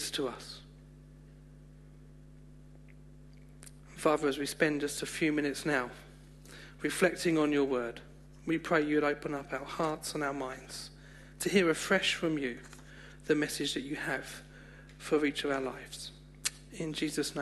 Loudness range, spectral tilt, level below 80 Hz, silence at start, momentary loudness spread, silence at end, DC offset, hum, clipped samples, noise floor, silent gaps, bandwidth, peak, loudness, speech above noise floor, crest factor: 4 LU; -4 dB/octave; -58 dBFS; 0 s; 22 LU; 0 s; under 0.1%; 50 Hz at -55 dBFS; under 0.1%; -53 dBFS; none; 12.5 kHz; -12 dBFS; -32 LUFS; 21 dB; 22 dB